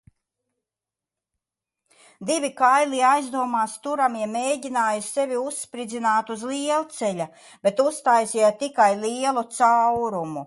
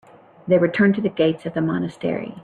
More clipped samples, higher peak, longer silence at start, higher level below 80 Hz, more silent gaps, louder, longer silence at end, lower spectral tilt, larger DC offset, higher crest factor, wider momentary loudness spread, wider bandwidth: neither; about the same, -6 dBFS vs -6 dBFS; first, 2.2 s vs 0.45 s; second, -70 dBFS vs -60 dBFS; neither; about the same, -22 LUFS vs -20 LUFS; about the same, 0 s vs 0 s; second, -3.5 dB/octave vs -8.5 dB/octave; neither; about the same, 18 dB vs 16 dB; about the same, 9 LU vs 9 LU; first, 11.5 kHz vs 9 kHz